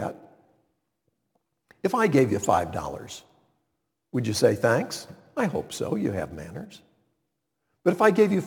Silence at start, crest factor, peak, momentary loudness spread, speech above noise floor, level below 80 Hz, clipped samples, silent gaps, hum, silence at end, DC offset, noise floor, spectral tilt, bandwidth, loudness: 0 s; 22 dB; -6 dBFS; 18 LU; 55 dB; -58 dBFS; under 0.1%; none; none; 0 s; under 0.1%; -79 dBFS; -5.5 dB/octave; 19 kHz; -25 LUFS